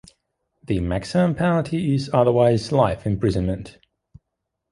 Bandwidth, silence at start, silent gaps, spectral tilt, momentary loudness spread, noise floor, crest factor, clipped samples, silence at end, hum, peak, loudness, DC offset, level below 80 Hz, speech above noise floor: 11.5 kHz; 0.7 s; none; -7.5 dB/octave; 9 LU; -80 dBFS; 20 dB; under 0.1%; 1 s; none; -2 dBFS; -21 LUFS; under 0.1%; -40 dBFS; 60 dB